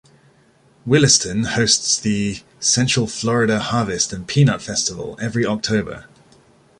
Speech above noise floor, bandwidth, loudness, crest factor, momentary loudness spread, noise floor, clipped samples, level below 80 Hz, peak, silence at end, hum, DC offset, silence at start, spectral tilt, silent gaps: 36 dB; 11.5 kHz; -18 LUFS; 20 dB; 9 LU; -54 dBFS; under 0.1%; -48 dBFS; 0 dBFS; 0.75 s; none; under 0.1%; 0.85 s; -3.5 dB/octave; none